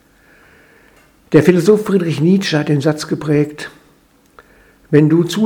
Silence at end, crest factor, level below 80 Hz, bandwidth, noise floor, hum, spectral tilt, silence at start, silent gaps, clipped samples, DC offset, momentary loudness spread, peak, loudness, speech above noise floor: 0 s; 16 dB; -54 dBFS; 17.5 kHz; -52 dBFS; none; -7 dB/octave; 1.3 s; none; under 0.1%; under 0.1%; 9 LU; 0 dBFS; -14 LUFS; 39 dB